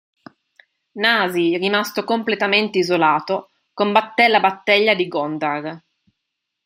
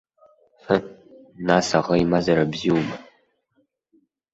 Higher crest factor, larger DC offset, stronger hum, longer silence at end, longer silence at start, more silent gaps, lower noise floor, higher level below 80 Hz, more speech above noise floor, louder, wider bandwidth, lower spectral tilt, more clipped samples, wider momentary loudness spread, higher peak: about the same, 18 dB vs 20 dB; neither; neither; second, 0.85 s vs 1.3 s; first, 0.95 s vs 0.7 s; neither; first, -79 dBFS vs -69 dBFS; second, -70 dBFS vs -52 dBFS; first, 60 dB vs 48 dB; first, -18 LUFS vs -21 LUFS; first, 16 kHz vs 8 kHz; about the same, -4.5 dB/octave vs -5.5 dB/octave; neither; second, 9 LU vs 12 LU; first, 0 dBFS vs -4 dBFS